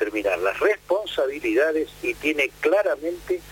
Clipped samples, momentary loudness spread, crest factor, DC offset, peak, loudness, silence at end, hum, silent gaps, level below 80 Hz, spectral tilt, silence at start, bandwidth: under 0.1%; 6 LU; 16 dB; under 0.1%; -8 dBFS; -23 LUFS; 0 s; 50 Hz at -55 dBFS; none; -52 dBFS; -4 dB/octave; 0 s; 17 kHz